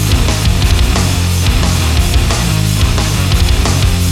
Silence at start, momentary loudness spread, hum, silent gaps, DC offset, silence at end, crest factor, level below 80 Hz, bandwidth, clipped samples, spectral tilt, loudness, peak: 0 s; 1 LU; none; none; under 0.1%; 0 s; 10 dB; -16 dBFS; 16.5 kHz; under 0.1%; -4.5 dB/octave; -12 LUFS; 0 dBFS